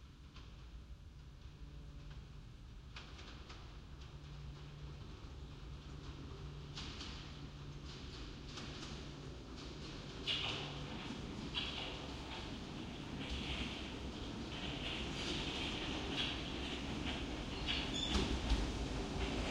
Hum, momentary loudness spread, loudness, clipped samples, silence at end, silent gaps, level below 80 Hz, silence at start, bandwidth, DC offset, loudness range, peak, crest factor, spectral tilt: none; 16 LU; -44 LUFS; under 0.1%; 0 s; none; -50 dBFS; 0 s; 11.5 kHz; under 0.1%; 14 LU; -22 dBFS; 22 dB; -4.5 dB/octave